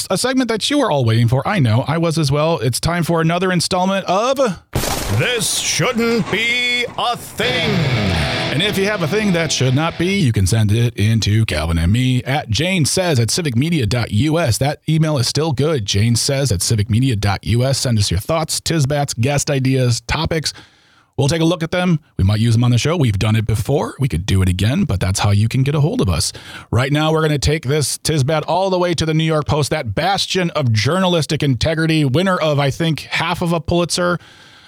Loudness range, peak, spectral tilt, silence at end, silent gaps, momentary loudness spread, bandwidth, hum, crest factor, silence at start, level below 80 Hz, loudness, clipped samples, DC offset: 1 LU; -6 dBFS; -5 dB/octave; 0.5 s; none; 3 LU; 16.5 kHz; none; 10 dB; 0 s; -38 dBFS; -17 LUFS; under 0.1%; under 0.1%